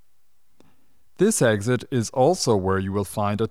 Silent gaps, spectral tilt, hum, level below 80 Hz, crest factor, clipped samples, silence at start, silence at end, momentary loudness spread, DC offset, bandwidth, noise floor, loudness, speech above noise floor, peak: none; -5 dB/octave; none; -58 dBFS; 16 dB; under 0.1%; 1.2 s; 0 s; 6 LU; 0.4%; 16 kHz; -71 dBFS; -22 LUFS; 50 dB; -8 dBFS